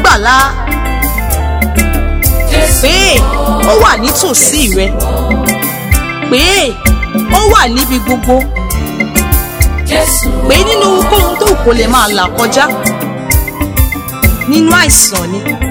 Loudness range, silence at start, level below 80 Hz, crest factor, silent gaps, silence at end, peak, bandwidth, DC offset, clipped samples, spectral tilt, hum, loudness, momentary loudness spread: 2 LU; 0 s; -16 dBFS; 10 dB; none; 0 s; 0 dBFS; over 20 kHz; under 0.1%; 2%; -3.5 dB/octave; none; -9 LUFS; 7 LU